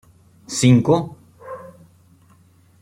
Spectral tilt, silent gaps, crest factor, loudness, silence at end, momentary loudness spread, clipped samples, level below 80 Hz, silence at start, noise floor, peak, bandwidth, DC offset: -6 dB/octave; none; 20 dB; -17 LUFS; 1.15 s; 23 LU; under 0.1%; -56 dBFS; 0.5 s; -53 dBFS; -2 dBFS; 13.5 kHz; under 0.1%